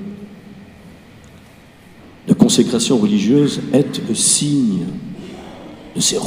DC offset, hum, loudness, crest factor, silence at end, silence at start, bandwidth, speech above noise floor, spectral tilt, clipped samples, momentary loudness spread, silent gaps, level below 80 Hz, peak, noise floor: under 0.1%; none; -15 LUFS; 18 dB; 0 s; 0 s; 16 kHz; 28 dB; -4.5 dB/octave; under 0.1%; 22 LU; none; -52 dBFS; 0 dBFS; -43 dBFS